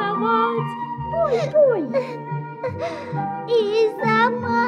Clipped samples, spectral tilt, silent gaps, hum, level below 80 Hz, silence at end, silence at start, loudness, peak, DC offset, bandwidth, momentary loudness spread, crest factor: under 0.1%; -7 dB/octave; none; none; -54 dBFS; 0 s; 0 s; -21 LUFS; -6 dBFS; under 0.1%; 9.4 kHz; 11 LU; 14 dB